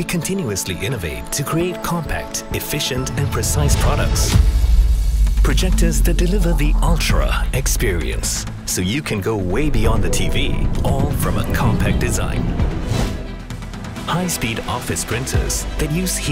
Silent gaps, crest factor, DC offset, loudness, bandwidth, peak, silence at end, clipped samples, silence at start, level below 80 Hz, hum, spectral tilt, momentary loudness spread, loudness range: none; 16 dB; under 0.1%; -19 LUFS; 16.5 kHz; -2 dBFS; 0 s; under 0.1%; 0 s; -20 dBFS; none; -4.5 dB/octave; 6 LU; 4 LU